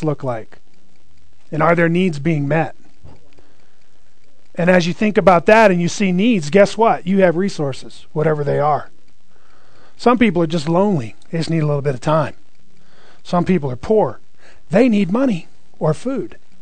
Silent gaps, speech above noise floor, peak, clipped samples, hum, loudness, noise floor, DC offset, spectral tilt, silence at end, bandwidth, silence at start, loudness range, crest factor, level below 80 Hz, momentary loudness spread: none; 41 dB; 0 dBFS; under 0.1%; none; -16 LUFS; -57 dBFS; 4%; -6.5 dB/octave; 0.25 s; 9.4 kHz; 0 s; 6 LU; 18 dB; -48 dBFS; 12 LU